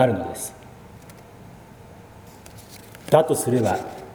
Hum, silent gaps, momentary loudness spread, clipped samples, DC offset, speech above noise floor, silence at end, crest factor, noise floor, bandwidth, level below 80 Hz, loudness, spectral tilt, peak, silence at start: none; none; 26 LU; under 0.1%; under 0.1%; 24 dB; 0 s; 24 dB; -45 dBFS; over 20 kHz; -54 dBFS; -22 LUFS; -5.5 dB/octave; 0 dBFS; 0 s